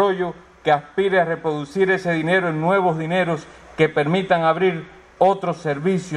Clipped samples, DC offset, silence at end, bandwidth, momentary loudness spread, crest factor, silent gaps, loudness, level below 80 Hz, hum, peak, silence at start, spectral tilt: under 0.1%; under 0.1%; 0 s; 10.5 kHz; 7 LU; 16 dB; none; -20 LUFS; -56 dBFS; none; -2 dBFS; 0 s; -6.5 dB/octave